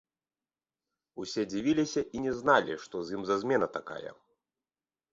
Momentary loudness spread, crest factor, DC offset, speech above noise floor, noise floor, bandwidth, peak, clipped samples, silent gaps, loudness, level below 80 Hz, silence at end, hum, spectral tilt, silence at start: 17 LU; 22 dB; under 0.1%; over 60 dB; under -90 dBFS; 7.8 kHz; -10 dBFS; under 0.1%; none; -30 LUFS; -66 dBFS; 1 s; none; -5 dB/octave; 1.15 s